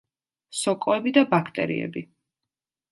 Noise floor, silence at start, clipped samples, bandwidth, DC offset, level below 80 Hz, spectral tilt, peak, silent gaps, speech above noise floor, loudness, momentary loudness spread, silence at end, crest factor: -88 dBFS; 0.5 s; under 0.1%; 11.5 kHz; under 0.1%; -70 dBFS; -5 dB/octave; -4 dBFS; none; 64 dB; -24 LUFS; 14 LU; 0.85 s; 22 dB